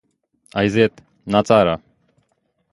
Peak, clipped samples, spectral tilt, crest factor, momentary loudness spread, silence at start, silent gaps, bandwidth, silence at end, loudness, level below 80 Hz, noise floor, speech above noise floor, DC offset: 0 dBFS; under 0.1%; -6.5 dB/octave; 20 dB; 13 LU; 0.55 s; none; 11.5 kHz; 0.95 s; -18 LUFS; -50 dBFS; -68 dBFS; 52 dB; under 0.1%